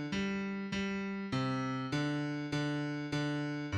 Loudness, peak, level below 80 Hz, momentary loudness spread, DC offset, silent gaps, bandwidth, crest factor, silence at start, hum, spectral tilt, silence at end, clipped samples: -36 LUFS; -22 dBFS; -62 dBFS; 2 LU; under 0.1%; none; 11 kHz; 14 dB; 0 s; none; -6 dB/octave; 0 s; under 0.1%